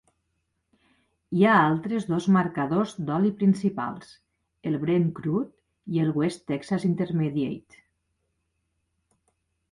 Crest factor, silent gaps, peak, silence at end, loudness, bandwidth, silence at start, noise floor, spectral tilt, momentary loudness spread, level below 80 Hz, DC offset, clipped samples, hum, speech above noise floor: 20 dB; none; -8 dBFS; 2.15 s; -25 LUFS; 11.5 kHz; 1.3 s; -76 dBFS; -7.5 dB/octave; 12 LU; -64 dBFS; under 0.1%; under 0.1%; none; 52 dB